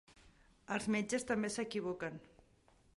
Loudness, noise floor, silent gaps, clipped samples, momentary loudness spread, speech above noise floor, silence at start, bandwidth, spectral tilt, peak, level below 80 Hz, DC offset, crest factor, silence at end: -39 LUFS; -69 dBFS; none; under 0.1%; 8 LU; 31 dB; 0.1 s; 11.5 kHz; -4.5 dB/octave; -22 dBFS; -70 dBFS; under 0.1%; 18 dB; 0.7 s